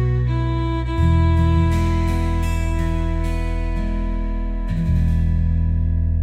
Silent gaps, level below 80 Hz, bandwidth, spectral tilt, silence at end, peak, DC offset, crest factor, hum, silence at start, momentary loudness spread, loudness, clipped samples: none; -22 dBFS; 9 kHz; -8 dB/octave; 0 s; -6 dBFS; under 0.1%; 12 dB; none; 0 s; 8 LU; -21 LUFS; under 0.1%